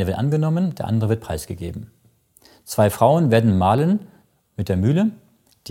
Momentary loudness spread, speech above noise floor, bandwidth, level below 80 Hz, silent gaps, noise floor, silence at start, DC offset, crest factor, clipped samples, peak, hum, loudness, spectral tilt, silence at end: 15 LU; 37 dB; 17 kHz; -48 dBFS; none; -56 dBFS; 0 s; under 0.1%; 18 dB; under 0.1%; -2 dBFS; none; -20 LUFS; -7.5 dB/octave; 0 s